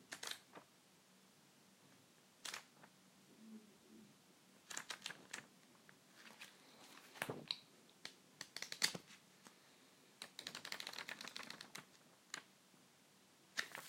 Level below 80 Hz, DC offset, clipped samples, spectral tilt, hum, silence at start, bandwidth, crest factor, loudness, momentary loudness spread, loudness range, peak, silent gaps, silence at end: under -90 dBFS; under 0.1%; under 0.1%; -1 dB/octave; none; 0 s; 16.5 kHz; 36 dB; -49 LUFS; 21 LU; 11 LU; -18 dBFS; none; 0 s